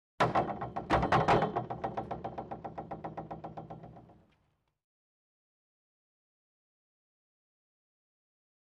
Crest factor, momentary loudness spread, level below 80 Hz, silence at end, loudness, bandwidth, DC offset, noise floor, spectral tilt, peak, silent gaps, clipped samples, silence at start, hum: 20 dB; 18 LU; -54 dBFS; 4.55 s; -33 LUFS; 11.5 kHz; under 0.1%; -76 dBFS; -6.5 dB/octave; -16 dBFS; none; under 0.1%; 0.2 s; none